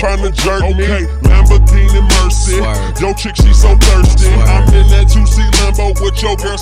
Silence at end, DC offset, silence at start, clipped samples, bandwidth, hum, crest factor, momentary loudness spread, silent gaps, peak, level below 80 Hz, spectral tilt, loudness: 0 s; under 0.1%; 0 s; 0.4%; 13.5 kHz; none; 8 dB; 7 LU; none; 0 dBFS; -8 dBFS; -5 dB/octave; -11 LUFS